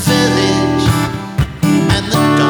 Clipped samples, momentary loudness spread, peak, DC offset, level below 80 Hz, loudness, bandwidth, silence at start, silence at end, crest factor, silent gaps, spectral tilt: under 0.1%; 7 LU; 0 dBFS; under 0.1%; -30 dBFS; -14 LUFS; over 20 kHz; 0 s; 0 s; 12 dB; none; -5 dB/octave